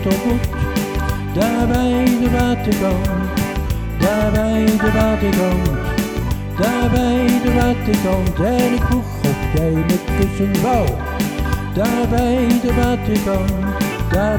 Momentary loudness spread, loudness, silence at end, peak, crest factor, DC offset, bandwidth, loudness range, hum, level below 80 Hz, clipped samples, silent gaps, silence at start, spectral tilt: 5 LU; -17 LUFS; 0 s; 0 dBFS; 16 dB; under 0.1%; over 20 kHz; 1 LU; none; -24 dBFS; under 0.1%; none; 0 s; -6.5 dB/octave